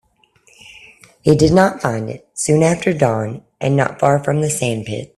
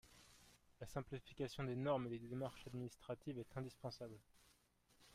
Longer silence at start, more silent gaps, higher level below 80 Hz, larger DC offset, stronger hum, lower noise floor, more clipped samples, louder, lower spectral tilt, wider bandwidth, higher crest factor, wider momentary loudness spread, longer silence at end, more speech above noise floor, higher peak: first, 0.65 s vs 0.05 s; neither; first, -46 dBFS vs -70 dBFS; neither; neither; second, -55 dBFS vs -76 dBFS; neither; first, -17 LUFS vs -48 LUFS; about the same, -5.5 dB/octave vs -6.5 dB/octave; second, 13 kHz vs 15.5 kHz; about the same, 18 dB vs 20 dB; second, 11 LU vs 22 LU; about the same, 0.1 s vs 0 s; first, 39 dB vs 29 dB; first, 0 dBFS vs -30 dBFS